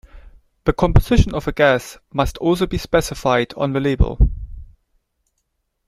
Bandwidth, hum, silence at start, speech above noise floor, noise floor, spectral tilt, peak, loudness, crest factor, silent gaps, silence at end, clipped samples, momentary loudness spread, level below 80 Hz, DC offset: 15 kHz; none; 0.15 s; 55 dB; -72 dBFS; -6.5 dB/octave; -2 dBFS; -19 LUFS; 18 dB; none; 1.2 s; under 0.1%; 7 LU; -24 dBFS; under 0.1%